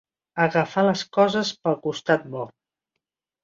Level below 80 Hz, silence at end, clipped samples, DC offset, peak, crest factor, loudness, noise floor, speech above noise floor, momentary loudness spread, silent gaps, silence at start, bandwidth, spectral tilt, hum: -66 dBFS; 0.95 s; under 0.1%; under 0.1%; -4 dBFS; 20 dB; -22 LUFS; -83 dBFS; 61 dB; 13 LU; none; 0.35 s; 7.8 kHz; -5.5 dB/octave; none